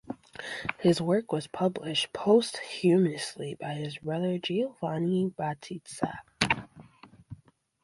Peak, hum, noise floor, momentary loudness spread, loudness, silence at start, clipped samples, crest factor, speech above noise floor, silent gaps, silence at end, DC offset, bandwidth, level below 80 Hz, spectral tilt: -6 dBFS; none; -55 dBFS; 12 LU; -29 LUFS; 0.05 s; under 0.1%; 24 dB; 27 dB; none; 0.5 s; under 0.1%; 11.5 kHz; -62 dBFS; -5.5 dB/octave